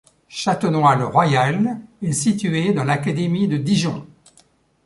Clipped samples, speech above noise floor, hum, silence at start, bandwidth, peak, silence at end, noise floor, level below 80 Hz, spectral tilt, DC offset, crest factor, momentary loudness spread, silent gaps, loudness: under 0.1%; 38 dB; none; 0.3 s; 11.5 kHz; -2 dBFS; 0.8 s; -57 dBFS; -56 dBFS; -5.5 dB/octave; under 0.1%; 18 dB; 9 LU; none; -19 LUFS